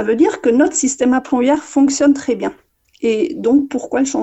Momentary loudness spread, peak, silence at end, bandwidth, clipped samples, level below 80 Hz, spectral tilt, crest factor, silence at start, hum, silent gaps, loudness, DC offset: 7 LU; -2 dBFS; 0 s; 8.6 kHz; under 0.1%; -54 dBFS; -3.5 dB/octave; 14 dB; 0 s; none; none; -15 LUFS; under 0.1%